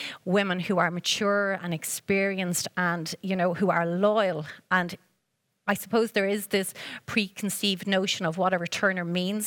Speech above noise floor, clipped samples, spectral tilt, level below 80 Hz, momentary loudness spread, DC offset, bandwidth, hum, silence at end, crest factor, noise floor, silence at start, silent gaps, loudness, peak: 50 dB; under 0.1%; -4 dB/octave; -70 dBFS; 6 LU; under 0.1%; 19.5 kHz; none; 0 s; 18 dB; -77 dBFS; 0 s; none; -26 LUFS; -8 dBFS